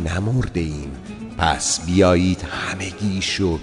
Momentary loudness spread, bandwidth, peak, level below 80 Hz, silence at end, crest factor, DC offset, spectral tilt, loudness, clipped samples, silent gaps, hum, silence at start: 14 LU; 11 kHz; -2 dBFS; -38 dBFS; 0 s; 18 dB; under 0.1%; -4.5 dB/octave; -20 LUFS; under 0.1%; none; none; 0 s